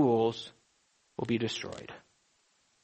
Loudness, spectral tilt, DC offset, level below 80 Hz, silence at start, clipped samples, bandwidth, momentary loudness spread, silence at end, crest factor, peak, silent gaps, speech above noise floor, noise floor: -33 LUFS; -6 dB/octave; under 0.1%; -70 dBFS; 0 s; under 0.1%; 8.4 kHz; 20 LU; 0.85 s; 18 dB; -16 dBFS; none; 36 dB; -72 dBFS